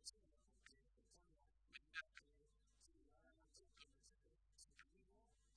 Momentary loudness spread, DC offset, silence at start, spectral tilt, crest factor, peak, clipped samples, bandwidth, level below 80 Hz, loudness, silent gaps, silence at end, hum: 14 LU; under 0.1%; 0 s; -0.5 dB/octave; 32 dB; -36 dBFS; under 0.1%; 9.6 kHz; -80 dBFS; -61 LUFS; none; 0 s; none